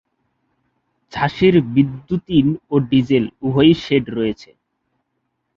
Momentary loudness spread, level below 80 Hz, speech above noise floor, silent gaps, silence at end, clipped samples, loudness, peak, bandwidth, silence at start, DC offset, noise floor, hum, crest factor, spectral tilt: 9 LU; -48 dBFS; 56 dB; none; 1.1 s; under 0.1%; -17 LUFS; -2 dBFS; 7 kHz; 1.15 s; under 0.1%; -72 dBFS; none; 16 dB; -8 dB/octave